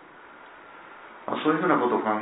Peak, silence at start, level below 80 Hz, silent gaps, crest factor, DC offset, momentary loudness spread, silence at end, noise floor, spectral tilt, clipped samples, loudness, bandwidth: -6 dBFS; 0.15 s; -78 dBFS; none; 22 dB; under 0.1%; 24 LU; 0 s; -48 dBFS; -10 dB/octave; under 0.1%; -24 LUFS; 4 kHz